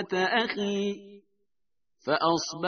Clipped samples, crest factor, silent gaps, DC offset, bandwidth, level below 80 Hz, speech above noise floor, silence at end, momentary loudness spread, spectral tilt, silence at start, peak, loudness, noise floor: under 0.1%; 20 dB; none; under 0.1%; 6.6 kHz; -72 dBFS; 60 dB; 0 s; 11 LU; -2.5 dB/octave; 0 s; -10 dBFS; -27 LUFS; -87 dBFS